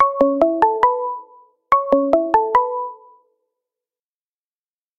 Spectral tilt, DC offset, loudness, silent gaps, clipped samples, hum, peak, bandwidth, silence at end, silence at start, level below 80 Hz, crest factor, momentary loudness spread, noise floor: -7 dB/octave; under 0.1%; -17 LUFS; none; under 0.1%; none; 0 dBFS; 7.4 kHz; 2.05 s; 0 s; -54 dBFS; 20 dB; 12 LU; under -90 dBFS